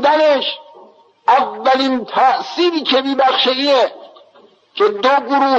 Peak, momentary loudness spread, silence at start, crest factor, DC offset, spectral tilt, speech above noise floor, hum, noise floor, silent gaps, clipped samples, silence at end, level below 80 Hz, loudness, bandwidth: -2 dBFS; 7 LU; 0 s; 12 dB; under 0.1%; -3 dB/octave; 35 dB; none; -49 dBFS; none; under 0.1%; 0 s; -70 dBFS; -15 LUFS; 8 kHz